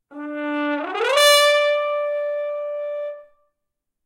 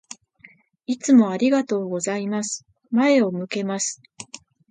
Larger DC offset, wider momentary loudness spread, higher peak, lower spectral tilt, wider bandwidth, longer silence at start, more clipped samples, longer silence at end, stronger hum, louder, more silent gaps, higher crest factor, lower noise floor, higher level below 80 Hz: neither; second, 16 LU vs 22 LU; about the same, -4 dBFS vs -4 dBFS; second, 1 dB/octave vs -4.5 dB/octave; first, 16 kHz vs 9.6 kHz; second, 0.1 s vs 0.9 s; neither; first, 0.8 s vs 0.35 s; neither; about the same, -19 LUFS vs -21 LUFS; neither; about the same, 18 dB vs 18 dB; first, -79 dBFS vs -53 dBFS; about the same, -68 dBFS vs -72 dBFS